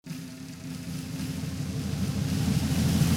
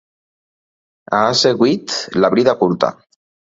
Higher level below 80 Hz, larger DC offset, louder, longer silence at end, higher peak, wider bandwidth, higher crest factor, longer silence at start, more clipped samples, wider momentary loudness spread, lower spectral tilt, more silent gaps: first, -44 dBFS vs -58 dBFS; neither; second, -30 LUFS vs -15 LUFS; second, 0 s vs 0.65 s; second, -14 dBFS vs 0 dBFS; first, 17 kHz vs 7.8 kHz; about the same, 16 dB vs 18 dB; second, 0.05 s vs 1.1 s; neither; first, 13 LU vs 7 LU; about the same, -5.5 dB/octave vs -4.5 dB/octave; neither